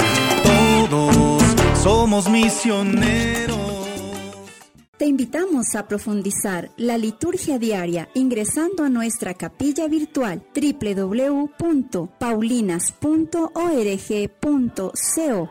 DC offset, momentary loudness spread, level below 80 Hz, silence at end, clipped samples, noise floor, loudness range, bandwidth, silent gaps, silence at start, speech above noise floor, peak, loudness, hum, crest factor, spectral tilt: under 0.1%; 10 LU; -36 dBFS; 0 s; under 0.1%; -43 dBFS; 7 LU; 16.5 kHz; 4.88-4.93 s; 0 s; 23 dB; -4 dBFS; -20 LUFS; none; 16 dB; -4.5 dB/octave